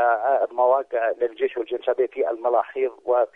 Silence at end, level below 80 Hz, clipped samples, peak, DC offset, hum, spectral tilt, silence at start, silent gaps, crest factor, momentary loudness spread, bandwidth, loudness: 0.1 s; -72 dBFS; under 0.1%; -8 dBFS; under 0.1%; none; -5.5 dB/octave; 0 s; none; 14 dB; 6 LU; 3.9 kHz; -23 LUFS